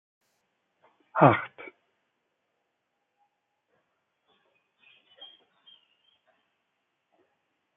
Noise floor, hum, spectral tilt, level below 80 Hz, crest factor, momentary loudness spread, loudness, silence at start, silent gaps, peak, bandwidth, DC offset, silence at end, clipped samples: -80 dBFS; none; -6 dB/octave; -76 dBFS; 30 dB; 28 LU; -23 LUFS; 1.15 s; none; -4 dBFS; 3.9 kHz; under 0.1%; 6.3 s; under 0.1%